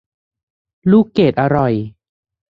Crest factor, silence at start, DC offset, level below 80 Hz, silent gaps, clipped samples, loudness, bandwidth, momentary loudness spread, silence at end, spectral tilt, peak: 16 dB; 0.85 s; under 0.1%; -48 dBFS; none; under 0.1%; -15 LUFS; 5.2 kHz; 10 LU; 0.65 s; -9.5 dB/octave; 0 dBFS